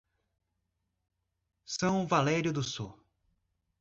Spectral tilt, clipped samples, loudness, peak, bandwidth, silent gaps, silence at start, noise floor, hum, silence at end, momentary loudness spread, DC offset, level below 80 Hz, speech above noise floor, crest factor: -5 dB/octave; under 0.1%; -31 LUFS; -12 dBFS; 8 kHz; none; 1.7 s; -83 dBFS; none; 0.9 s; 13 LU; under 0.1%; -66 dBFS; 53 dB; 22 dB